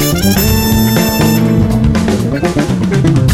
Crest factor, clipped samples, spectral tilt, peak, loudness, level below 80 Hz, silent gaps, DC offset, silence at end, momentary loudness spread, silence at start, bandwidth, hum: 10 dB; under 0.1%; -5.5 dB/octave; 0 dBFS; -11 LUFS; -22 dBFS; none; under 0.1%; 0 s; 3 LU; 0 s; 16.5 kHz; none